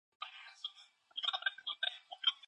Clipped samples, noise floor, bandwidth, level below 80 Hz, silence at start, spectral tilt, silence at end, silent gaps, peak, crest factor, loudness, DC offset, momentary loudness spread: under 0.1%; -62 dBFS; 10 kHz; under -90 dBFS; 0.2 s; 3 dB/octave; 0.15 s; none; -20 dBFS; 22 dB; -39 LUFS; under 0.1%; 13 LU